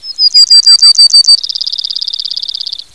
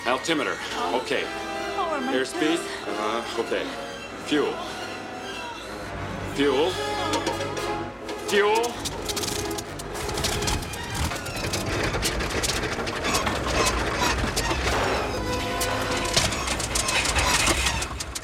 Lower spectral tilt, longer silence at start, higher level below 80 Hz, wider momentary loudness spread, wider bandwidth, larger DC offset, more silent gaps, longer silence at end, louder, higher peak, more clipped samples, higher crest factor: second, 5.5 dB/octave vs -3 dB/octave; about the same, 0 s vs 0 s; second, -60 dBFS vs -38 dBFS; first, 15 LU vs 11 LU; second, 11 kHz vs 17.5 kHz; first, 0.7% vs under 0.1%; neither; first, 0.2 s vs 0 s; first, -3 LUFS vs -25 LUFS; first, 0 dBFS vs -8 dBFS; first, 6% vs under 0.1%; second, 8 dB vs 20 dB